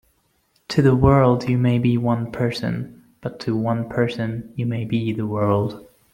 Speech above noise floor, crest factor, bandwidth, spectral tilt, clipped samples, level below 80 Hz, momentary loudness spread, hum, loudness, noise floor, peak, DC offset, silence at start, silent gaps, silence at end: 45 dB; 18 dB; 11 kHz; -8 dB/octave; under 0.1%; -44 dBFS; 14 LU; none; -21 LUFS; -65 dBFS; -2 dBFS; under 0.1%; 0.7 s; none; 0.3 s